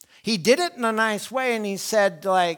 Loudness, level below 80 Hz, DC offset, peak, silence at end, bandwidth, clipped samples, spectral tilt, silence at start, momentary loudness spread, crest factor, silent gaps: -22 LUFS; -70 dBFS; under 0.1%; -6 dBFS; 0 s; 19.5 kHz; under 0.1%; -3.5 dB/octave; 0.25 s; 5 LU; 16 dB; none